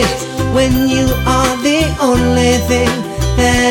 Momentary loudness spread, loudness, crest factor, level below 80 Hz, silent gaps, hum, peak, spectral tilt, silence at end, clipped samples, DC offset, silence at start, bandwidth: 5 LU; -13 LUFS; 12 dB; -22 dBFS; none; none; -2 dBFS; -4.5 dB/octave; 0 s; under 0.1%; under 0.1%; 0 s; 17.5 kHz